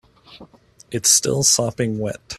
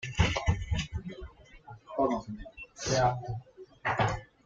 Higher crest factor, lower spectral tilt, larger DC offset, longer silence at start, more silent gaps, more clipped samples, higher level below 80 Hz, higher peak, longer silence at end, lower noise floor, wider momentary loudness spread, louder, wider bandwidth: about the same, 20 dB vs 22 dB; second, -2.5 dB/octave vs -5 dB/octave; neither; first, 0.3 s vs 0 s; neither; neither; second, -54 dBFS vs -44 dBFS; first, -2 dBFS vs -10 dBFS; second, 0 s vs 0.2 s; about the same, -48 dBFS vs -51 dBFS; second, 12 LU vs 18 LU; first, -17 LUFS vs -32 LUFS; first, 15.5 kHz vs 7.8 kHz